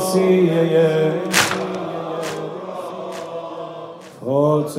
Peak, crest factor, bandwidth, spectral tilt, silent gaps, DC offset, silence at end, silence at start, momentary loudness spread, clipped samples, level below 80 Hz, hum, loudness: 0 dBFS; 20 dB; 16 kHz; -5 dB/octave; none; under 0.1%; 0 s; 0 s; 16 LU; under 0.1%; -66 dBFS; none; -19 LUFS